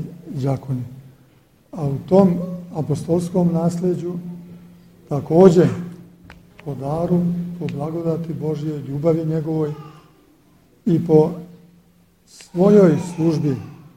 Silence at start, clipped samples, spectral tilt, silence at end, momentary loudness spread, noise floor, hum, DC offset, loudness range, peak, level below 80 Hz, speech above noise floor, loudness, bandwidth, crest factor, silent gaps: 0 s; under 0.1%; -9 dB/octave; 0.2 s; 17 LU; -55 dBFS; none; under 0.1%; 5 LU; 0 dBFS; -52 dBFS; 37 dB; -19 LUFS; 11 kHz; 20 dB; none